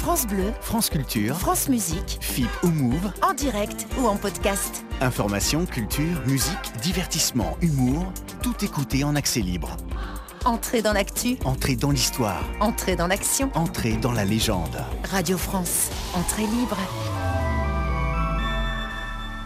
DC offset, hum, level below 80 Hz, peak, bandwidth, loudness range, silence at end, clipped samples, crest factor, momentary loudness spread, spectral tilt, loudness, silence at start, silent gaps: under 0.1%; none; -32 dBFS; -8 dBFS; 16 kHz; 2 LU; 0 s; under 0.1%; 16 dB; 6 LU; -4.5 dB/octave; -24 LUFS; 0 s; none